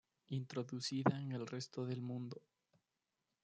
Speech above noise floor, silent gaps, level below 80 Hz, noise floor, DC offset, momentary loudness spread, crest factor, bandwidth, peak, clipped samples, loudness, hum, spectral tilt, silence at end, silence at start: 48 dB; none; -86 dBFS; -89 dBFS; under 0.1%; 10 LU; 24 dB; 9.2 kHz; -20 dBFS; under 0.1%; -43 LUFS; none; -6 dB/octave; 1.05 s; 0.3 s